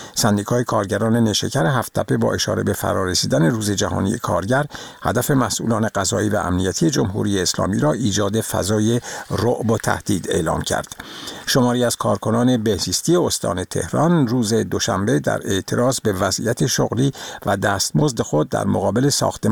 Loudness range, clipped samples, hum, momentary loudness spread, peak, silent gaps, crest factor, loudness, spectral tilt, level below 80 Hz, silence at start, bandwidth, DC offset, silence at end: 1 LU; under 0.1%; none; 4 LU; -2 dBFS; none; 18 dB; -19 LUFS; -4.5 dB/octave; -46 dBFS; 0 s; over 20 kHz; 0.2%; 0 s